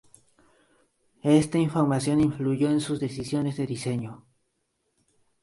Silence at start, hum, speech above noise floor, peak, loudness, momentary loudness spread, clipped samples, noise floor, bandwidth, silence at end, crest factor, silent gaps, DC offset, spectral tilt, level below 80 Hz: 1.25 s; none; 51 dB; -8 dBFS; -25 LUFS; 9 LU; under 0.1%; -75 dBFS; 11.5 kHz; 1.25 s; 20 dB; none; under 0.1%; -6.5 dB/octave; -58 dBFS